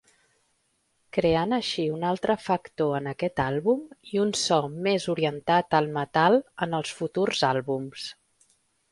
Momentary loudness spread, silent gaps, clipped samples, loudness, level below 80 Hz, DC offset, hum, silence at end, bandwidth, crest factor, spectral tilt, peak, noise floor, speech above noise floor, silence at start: 8 LU; none; under 0.1%; -26 LUFS; -58 dBFS; under 0.1%; none; 0.8 s; 11.5 kHz; 20 dB; -5 dB/octave; -6 dBFS; -71 dBFS; 46 dB; 1.15 s